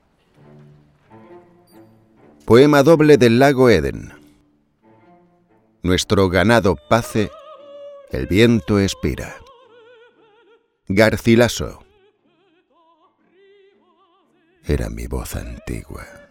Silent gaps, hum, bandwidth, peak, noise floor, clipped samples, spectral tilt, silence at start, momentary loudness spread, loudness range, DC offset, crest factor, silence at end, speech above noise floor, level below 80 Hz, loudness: none; none; 16.5 kHz; 0 dBFS; -60 dBFS; under 0.1%; -6 dB/octave; 2.45 s; 20 LU; 15 LU; under 0.1%; 18 dB; 0.25 s; 44 dB; -38 dBFS; -16 LUFS